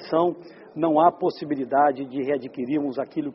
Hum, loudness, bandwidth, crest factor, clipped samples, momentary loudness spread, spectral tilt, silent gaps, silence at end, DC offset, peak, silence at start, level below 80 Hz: none; -24 LUFS; 5.8 kHz; 18 dB; under 0.1%; 10 LU; -5.5 dB/octave; none; 0 s; under 0.1%; -4 dBFS; 0 s; -70 dBFS